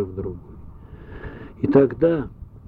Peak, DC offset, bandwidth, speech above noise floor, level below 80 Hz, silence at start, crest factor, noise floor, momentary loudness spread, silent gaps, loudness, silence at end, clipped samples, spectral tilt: -2 dBFS; under 0.1%; 4.6 kHz; 20 dB; -42 dBFS; 0 s; 20 dB; -40 dBFS; 22 LU; none; -20 LUFS; 0.1 s; under 0.1%; -11 dB/octave